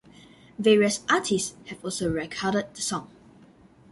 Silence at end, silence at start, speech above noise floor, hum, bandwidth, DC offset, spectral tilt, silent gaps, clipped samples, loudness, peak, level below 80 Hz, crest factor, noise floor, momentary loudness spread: 0.85 s; 0.6 s; 29 dB; none; 11.5 kHz; under 0.1%; -3.5 dB/octave; none; under 0.1%; -25 LUFS; -8 dBFS; -56 dBFS; 20 dB; -54 dBFS; 13 LU